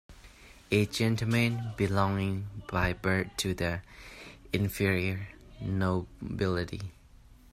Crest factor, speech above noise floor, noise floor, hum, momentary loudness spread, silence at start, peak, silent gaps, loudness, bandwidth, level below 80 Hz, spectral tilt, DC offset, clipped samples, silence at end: 20 dB; 25 dB; -55 dBFS; none; 14 LU; 0.1 s; -12 dBFS; none; -31 LUFS; 15.5 kHz; -50 dBFS; -6 dB/octave; under 0.1%; under 0.1%; 0.2 s